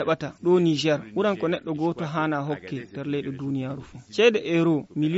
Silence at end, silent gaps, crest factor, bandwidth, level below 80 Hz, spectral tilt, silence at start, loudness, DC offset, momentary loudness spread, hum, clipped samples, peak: 0 s; none; 18 dB; 8 kHz; -62 dBFS; -5 dB/octave; 0 s; -25 LUFS; under 0.1%; 12 LU; none; under 0.1%; -6 dBFS